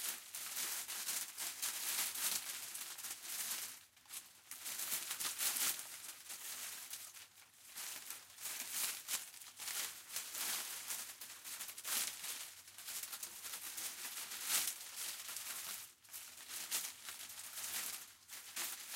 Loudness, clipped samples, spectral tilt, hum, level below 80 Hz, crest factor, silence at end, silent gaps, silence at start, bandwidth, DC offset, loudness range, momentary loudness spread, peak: -42 LUFS; under 0.1%; 2.5 dB/octave; none; -88 dBFS; 26 dB; 0 s; none; 0 s; 17 kHz; under 0.1%; 4 LU; 13 LU; -20 dBFS